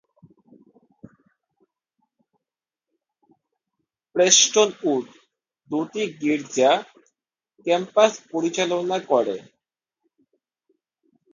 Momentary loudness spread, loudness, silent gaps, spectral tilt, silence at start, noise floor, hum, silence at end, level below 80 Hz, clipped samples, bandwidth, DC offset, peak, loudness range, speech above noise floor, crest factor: 14 LU; -21 LUFS; none; -2 dB/octave; 4.15 s; -89 dBFS; none; 1.9 s; -78 dBFS; under 0.1%; 10.5 kHz; under 0.1%; -2 dBFS; 5 LU; 68 dB; 24 dB